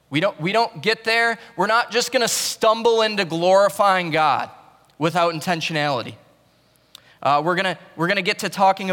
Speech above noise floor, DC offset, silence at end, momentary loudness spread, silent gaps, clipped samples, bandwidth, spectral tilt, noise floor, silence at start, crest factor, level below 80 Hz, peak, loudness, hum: 39 dB; under 0.1%; 0 s; 7 LU; none; under 0.1%; 18 kHz; -3.5 dB/octave; -58 dBFS; 0.1 s; 14 dB; -68 dBFS; -6 dBFS; -20 LUFS; none